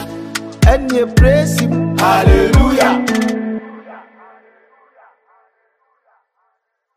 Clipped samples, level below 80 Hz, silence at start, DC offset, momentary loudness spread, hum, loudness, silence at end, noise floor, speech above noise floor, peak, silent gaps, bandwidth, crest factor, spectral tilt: under 0.1%; -20 dBFS; 0 s; under 0.1%; 14 LU; none; -13 LUFS; 2.95 s; -68 dBFS; 57 dB; 0 dBFS; none; 15.5 kHz; 14 dB; -6 dB/octave